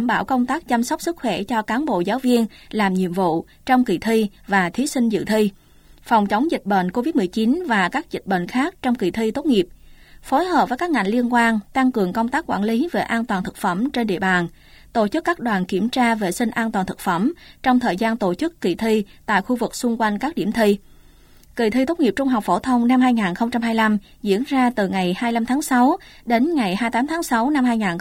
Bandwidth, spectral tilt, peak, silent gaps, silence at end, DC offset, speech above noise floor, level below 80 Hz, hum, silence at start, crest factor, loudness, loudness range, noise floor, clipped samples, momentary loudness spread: 16.5 kHz; -5.5 dB/octave; -4 dBFS; none; 0 s; under 0.1%; 29 dB; -50 dBFS; none; 0 s; 16 dB; -20 LUFS; 2 LU; -48 dBFS; under 0.1%; 5 LU